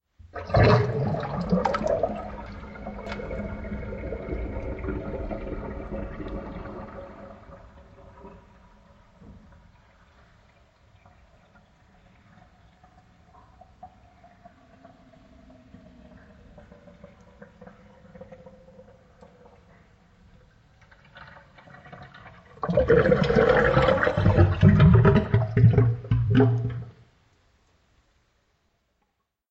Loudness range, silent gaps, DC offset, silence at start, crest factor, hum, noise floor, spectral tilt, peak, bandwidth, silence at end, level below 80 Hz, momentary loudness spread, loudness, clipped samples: 20 LU; none; under 0.1%; 0.35 s; 22 dB; none; -76 dBFS; -9 dB/octave; -6 dBFS; 7 kHz; 2.6 s; -40 dBFS; 26 LU; -23 LUFS; under 0.1%